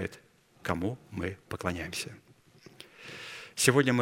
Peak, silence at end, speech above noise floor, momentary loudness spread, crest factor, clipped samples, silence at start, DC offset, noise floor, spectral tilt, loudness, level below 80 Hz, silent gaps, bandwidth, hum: -6 dBFS; 0 s; 30 dB; 21 LU; 28 dB; under 0.1%; 0 s; under 0.1%; -60 dBFS; -4 dB/octave; -32 LUFS; -60 dBFS; none; 16 kHz; none